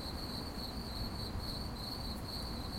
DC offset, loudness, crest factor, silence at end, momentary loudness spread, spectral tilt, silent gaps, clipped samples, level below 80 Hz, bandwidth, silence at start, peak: under 0.1%; -41 LUFS; 14 dB; 0 s; 1 LU; -5 dB/octave; none; under 0.1%; -46 dBFS; 16.5 kHz; 0 s; -28 dBFS